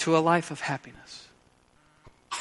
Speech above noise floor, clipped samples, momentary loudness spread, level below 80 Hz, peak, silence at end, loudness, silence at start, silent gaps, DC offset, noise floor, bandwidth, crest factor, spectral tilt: 35 dB; under 0.1%; 23 LU; -66 dBFS; -8 dBFS; 0 s; -27 LUFS; 0 s; none; under 0.1%; -62 dBFS; 11.5 kHz; 22 dB; -5 dB/octave